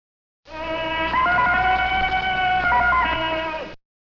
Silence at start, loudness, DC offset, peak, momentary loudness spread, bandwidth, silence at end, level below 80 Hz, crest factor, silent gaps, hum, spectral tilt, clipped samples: 0.45 s; -20 LUFS; under 0.1%; -10 dBFS; 13 LU; 6 kHz; 0.35 s; -38 dBFS; 12 dB; none; none; -5 dB/octave; under 0.1%